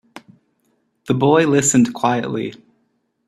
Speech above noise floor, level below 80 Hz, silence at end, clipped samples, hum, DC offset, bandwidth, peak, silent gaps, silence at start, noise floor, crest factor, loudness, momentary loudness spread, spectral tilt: 51 dB; -58 dBFS; 0.7 s; under 0.1%; none; under 0.1%; 13.5 kHz; 0 dBFS; none; 0.15 s; -67 dBFS; 18 dB; -16 LUFS; 12 LU; -5 dB/octave